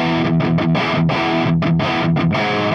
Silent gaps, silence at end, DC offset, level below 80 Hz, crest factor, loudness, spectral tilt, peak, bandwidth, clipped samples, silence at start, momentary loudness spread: none; 0 s; under 0.1%; -46 dBFS; 10 dB; -17 LUFS; -7.5 dB/octave; -6 dBFS; 6.6 kHz; under 0.1%; 0 s; 1 LU